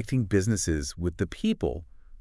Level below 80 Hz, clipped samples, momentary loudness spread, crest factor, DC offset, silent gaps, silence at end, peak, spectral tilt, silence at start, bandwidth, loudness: -42 dBFS; under 0.1%; 7 LU; 18 dB; under 0.1%; none; 0 s; -10 dBFS; -5.5 dB/octave; 0 s; 12 kHz; -28 LUFS